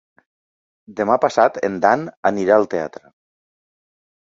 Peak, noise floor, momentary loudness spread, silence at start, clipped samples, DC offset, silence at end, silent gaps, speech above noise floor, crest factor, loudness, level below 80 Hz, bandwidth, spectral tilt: 0 dBFS; under -90 dBFS; 10 LU; 0.9 s; under 0.1%; under 0.1%; 1.35 s; 2.17-2.23 s; over 72 dB; 20 dB; -18 LUFS; -60 dBFS; 7.8 kHz; -6 dB/octave